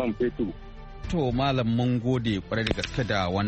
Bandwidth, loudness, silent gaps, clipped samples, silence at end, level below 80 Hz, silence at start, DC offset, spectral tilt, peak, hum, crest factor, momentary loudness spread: 8.4 kHz; -27 LUFS; none; under 0.1%; 0 s; -42 dBFS; 0 s; under 0.1%; -6.5 dB/octave; -8 dBFS; none; 18 dB; 8 LU